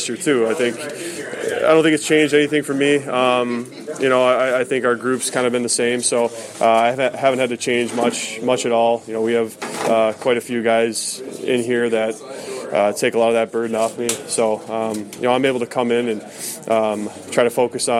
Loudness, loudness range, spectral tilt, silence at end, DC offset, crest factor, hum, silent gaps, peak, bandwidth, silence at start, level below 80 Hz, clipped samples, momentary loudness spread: -19 LUFS; 3 LU; -3.5 dB/octave; 0 s; under 0.1%; 18 dB; none; none; -2 dBFS; 15.5 kHz; 0 s; -70 dBFS; under 0.1%; 9 LU